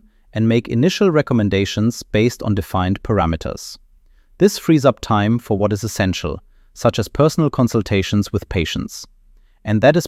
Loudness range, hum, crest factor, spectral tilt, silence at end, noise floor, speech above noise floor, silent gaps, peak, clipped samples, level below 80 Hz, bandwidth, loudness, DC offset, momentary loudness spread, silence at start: 2 LU; none; 16 dB; -6 dB/octave; 0 s; -50 dBFS; 34 dB; none; 0 dBFS; under 0.1%; -38 dBFS; 15.5 kHz; -18 LUFS; under 0.1%; 11 LU; 0.35 s